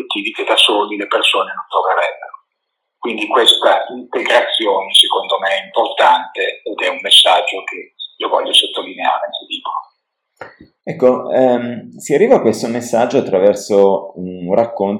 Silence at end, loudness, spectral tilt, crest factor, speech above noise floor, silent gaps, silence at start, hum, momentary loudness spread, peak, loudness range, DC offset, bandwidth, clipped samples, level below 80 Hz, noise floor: 0 s; -14 LUFS; -3 dB/octave; 16 dB; 59 dB; none; 0 s; none; 14 LU; 0 dBFS; 6 LU; under 0.1%; 18 kHz; under 0.1%; -66 dBFS; -74 dBFS